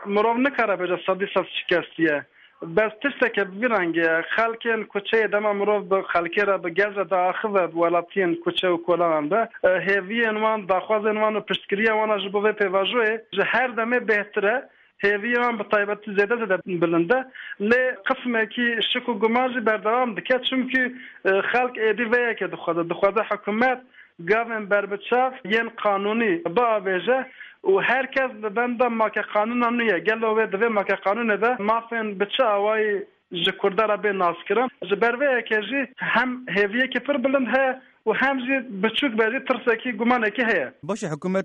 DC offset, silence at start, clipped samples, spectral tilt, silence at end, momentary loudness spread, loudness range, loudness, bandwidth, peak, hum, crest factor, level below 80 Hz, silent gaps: under 0.1%; 0 s; under 0.1%; -6 dB/octave; 0 s; 4 LU; 1 LU; -22 LUFS; 9 kHz; -8 dBFS; none; 16 dB; -66 dBFS; none